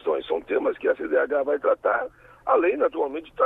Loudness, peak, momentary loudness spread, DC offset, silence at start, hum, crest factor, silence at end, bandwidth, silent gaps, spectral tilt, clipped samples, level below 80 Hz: -24 LUFS; -8 dBFS; 7 LU; under 0.1%; 0.05 s; none; 16 dB; 0 s; 4 kHz; none; -6.5 dB/octave; under 0.1%; -60 dBFS